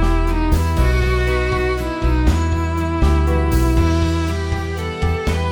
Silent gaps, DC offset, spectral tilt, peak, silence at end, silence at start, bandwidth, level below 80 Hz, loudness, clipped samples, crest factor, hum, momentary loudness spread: none; under 0.1%; -6.5 dB/octave; -2 dBFS; 0 s; 0 s; 19.5 kHz; -20 dBFS; -18 LUFS; under 0.1%; 14 dB; none; 5 LU